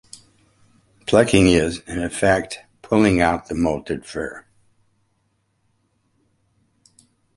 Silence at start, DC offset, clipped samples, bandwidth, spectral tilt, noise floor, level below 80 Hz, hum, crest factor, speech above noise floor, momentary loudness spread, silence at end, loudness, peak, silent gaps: 1.05 s; under 0.1%; under 0.1%; 11.5 kHz; -5.5 dB/octave; -68 dBFS; -42 dBFS; none; 22 dB; 50 dB; 18 LU; 2.95 s; -19 LUFS; -2 dBFS; none